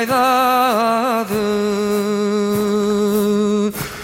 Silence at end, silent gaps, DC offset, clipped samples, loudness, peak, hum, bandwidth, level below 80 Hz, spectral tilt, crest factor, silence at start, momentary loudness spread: 0 s; none; under 0.1%; under 0.1%; -17 LUFS; -4 dBFS; none; 17 kHz; -50 dBFS; -5 dB/octave; 12 dB; 0 s; 5 LU